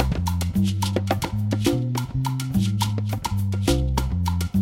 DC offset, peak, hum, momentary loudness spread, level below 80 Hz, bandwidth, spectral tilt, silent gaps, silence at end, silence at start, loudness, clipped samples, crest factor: under 0.1%; -4 dBFS; none; 3 LU; -32 dBFS; 16.5 kHz; -6 dB/octave; none; 0 s; 0 s; -24 LUFS; under 0.1%; 18 dB